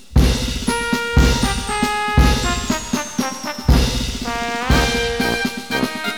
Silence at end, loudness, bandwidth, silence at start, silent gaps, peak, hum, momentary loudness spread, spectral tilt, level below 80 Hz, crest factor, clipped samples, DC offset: 0 s; -19 LUFS; 19 kHz; 0.1 s; none; 0 dBFS; none; 7 LU; -4.5 dB/octave; -22 dBFS; 18 dB; under 0.1%; 0.8%